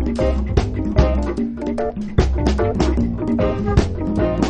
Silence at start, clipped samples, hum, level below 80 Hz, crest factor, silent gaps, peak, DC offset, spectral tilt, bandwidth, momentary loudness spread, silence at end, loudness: 0 s; under 0.1%; none; -22 dBFS; 18 dB; none; 0 dBFS; under 0.1%; -7.5 dB/octave; 8.8 kHz; 5 LU; 0 s; -20 LUFS